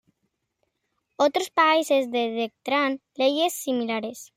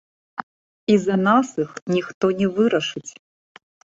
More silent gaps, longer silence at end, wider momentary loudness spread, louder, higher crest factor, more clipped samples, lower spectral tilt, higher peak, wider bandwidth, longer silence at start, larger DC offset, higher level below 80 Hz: second, none vs 0.43-0.87 s, 1.82-1.86 s, 2.14-2.21 s; second, 0.1 s vs 0.9 s; second, 8 LU vs 18 LU; second, -24 LUFS vs -21 LUFS; about the same, 16 dB vs 18 dB; neither; second, -2.5 dB/octave vs -6 dB/octave; second, -8 dBFS vs -4 dBFS; first, 16 kHz vs 7.8 kHz; first, 1.2 s vs 0.4 s; neither; second, -78 dBFS vs -62 dBFS